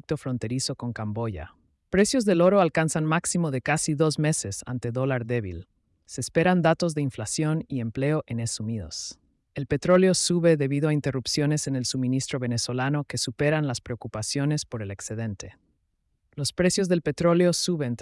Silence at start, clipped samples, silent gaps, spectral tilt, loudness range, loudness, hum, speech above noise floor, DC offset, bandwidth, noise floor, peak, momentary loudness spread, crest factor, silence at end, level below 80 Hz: 0.1 s; under 0.1%; none; -5 dB/octave; 5 LU; -25 LUFS; none; 48 dB; under 0.1%; 12 kHz; -73 dBFS; -8 dBFS; 13 LU; 16 dB; 0 s; -56 dBFS